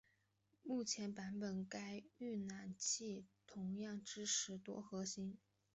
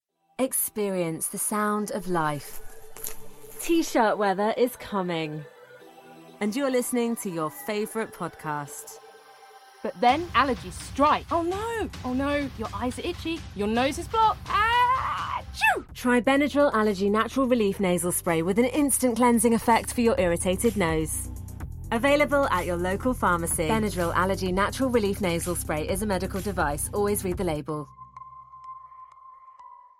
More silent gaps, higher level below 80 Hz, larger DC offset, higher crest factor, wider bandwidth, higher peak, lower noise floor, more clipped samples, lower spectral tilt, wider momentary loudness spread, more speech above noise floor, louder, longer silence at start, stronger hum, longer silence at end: neither; second, -84 dBFS vs -44 dBFS; neither; about the same, 18 dB vs 20 dB; second, 8.2 kHz vs 16 kHz; second, -30 dBFS vs -6 dBFS; first, -82 dBFS vs -50 dBFS; neither; second, -3 dB/octave vs -4.5 dB/octave; second, 11 LU vs 15 LU; first, 35 dB vs 25 dB; second, -46 LUFS vs -25 LUFS; first, 0.65 s vs 0.4 s; neither; first, 0.4 s vs 0.25 s